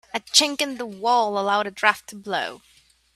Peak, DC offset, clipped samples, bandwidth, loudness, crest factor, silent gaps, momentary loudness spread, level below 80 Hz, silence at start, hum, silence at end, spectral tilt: 0 dBFS; under 0.1%; under 0.1%; 15.5 kHz; -21 LUFS; 24 dB; none; 11 LU; -68 dBFS; 0.15 s; none; 0.6 s; -1 dB/octave